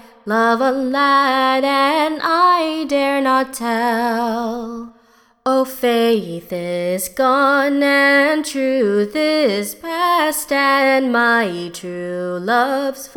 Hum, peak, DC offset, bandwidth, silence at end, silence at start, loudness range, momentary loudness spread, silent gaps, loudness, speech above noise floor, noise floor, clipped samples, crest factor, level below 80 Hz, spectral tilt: none; -2 dBFS; under 0.1%; 20 kHz; 0.1 s; 0.25 s; 4 LU; 10 LU; none; -16 LUFS; 37 dB; -53 dBFS; under 0.1%; 14 dB; -58 dBFS; -3.5 dB/octave